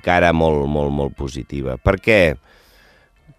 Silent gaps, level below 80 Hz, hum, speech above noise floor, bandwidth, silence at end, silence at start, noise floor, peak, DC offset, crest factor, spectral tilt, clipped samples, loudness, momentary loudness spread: none; -32 dBFS; none; 35 dB; 15 kHz; 1 s; 0.05 s; -52 dBFS; 0 dBFS; under 0.1%; 18 dB; -6.5 dB/octave; under 0.1%; -18 LUFS; 12 LU